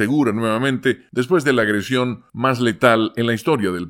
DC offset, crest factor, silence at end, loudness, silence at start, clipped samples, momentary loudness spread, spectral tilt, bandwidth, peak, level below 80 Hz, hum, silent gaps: under 0.1%; 18 dB; 0 s; -18 LUFS; 0 s; under 0.1%; 6 LU; -6 dB/octave; 17 kHz; 0 dBFS; -60 dBFS; none; none